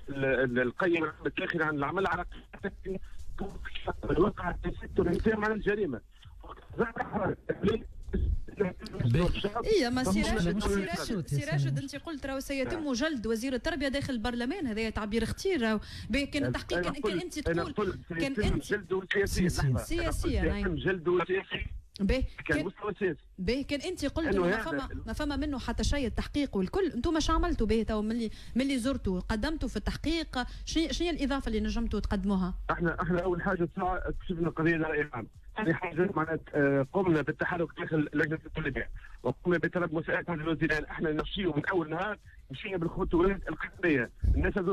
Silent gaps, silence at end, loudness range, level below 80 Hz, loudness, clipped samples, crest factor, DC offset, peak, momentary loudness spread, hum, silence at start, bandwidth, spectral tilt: none; 0 s; 2 LU; -40 dBFS; -31 LUFS; under 0.1%; 16 dB; under 0.1%; -14 dBFS; 8 LU; none; 0 s; 14.5 kHz; -6 dB/octave